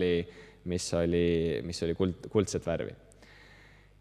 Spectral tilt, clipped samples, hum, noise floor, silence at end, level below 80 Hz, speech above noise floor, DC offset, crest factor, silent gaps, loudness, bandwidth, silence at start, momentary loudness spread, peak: -5.5 dB/octave; under 0.1%; 50 Hz at -55 dBFS; -56 dBFS; 0.75 s; -56 dBFS; 26 dB; under 0.1%; 18 dB; none; -31 LUFS; 13 kHz; 0 s; 10 LU; -14 dBFS